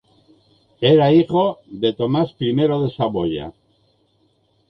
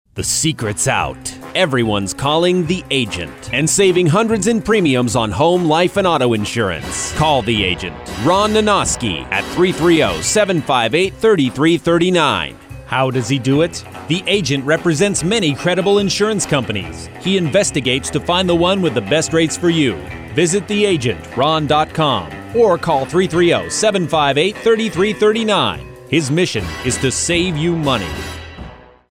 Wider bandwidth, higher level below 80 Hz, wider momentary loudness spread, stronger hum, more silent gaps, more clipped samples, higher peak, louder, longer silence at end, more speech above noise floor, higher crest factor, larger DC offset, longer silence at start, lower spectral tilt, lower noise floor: second, 5.8 kHz vs 16 kHz; second, -52 dBFS vs -40 dBFS; first, 10 LU vs 7 LU; neither; neither; neither; about the same, -2 dBFS vs -4 dBFS; about the same, -18 LUFS vs -16 LUFS; first, 1.2 s vs 0.35 s; first, 45 dB vs 20 dB; first, 18 dB vs 12 dB; neither; first, 0.8 s vs 0.15 s; first, -9.5 dB/octave vs -4 dB/octave; first, -62 dBFS vs -36 dBFS